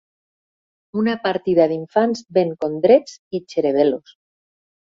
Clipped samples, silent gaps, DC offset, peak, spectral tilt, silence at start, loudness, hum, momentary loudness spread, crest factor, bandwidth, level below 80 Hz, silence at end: under 0.1%; 3.19-3.31 s; under 0.1%; -2 dBFS; -6.5 dB/octave; 0.95 s; -19 LUFS; none; 13 LU; 18 dB; 7.6 kHz; -62 dBFS; 0.9 s